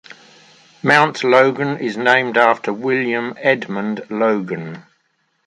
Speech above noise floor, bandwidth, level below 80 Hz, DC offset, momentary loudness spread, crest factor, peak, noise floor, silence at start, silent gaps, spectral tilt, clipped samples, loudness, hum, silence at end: 49 dB; 11.5 kHz; -66 dBFS; under 0.1%; 10 LU; 18 dB; 0 dBFS; -65 dBFS; 0.85 s; none; -5.5 dB/octave; under 0.1%; -16 LUFS; none; 0.65 s